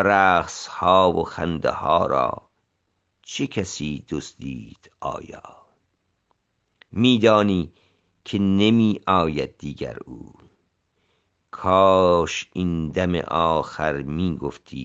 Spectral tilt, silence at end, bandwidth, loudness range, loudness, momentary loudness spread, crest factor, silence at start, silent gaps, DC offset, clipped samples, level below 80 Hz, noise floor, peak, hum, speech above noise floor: -5.5 dB/octave; 0 s; 8.2 kHz; 11 LU; -21 LUFS; 18 LU; 20 dB; 0 s; none; under 0.1%; under 0.1%; -52 dBFS; -73 dBFS; -2 dBFS; none; 52 dB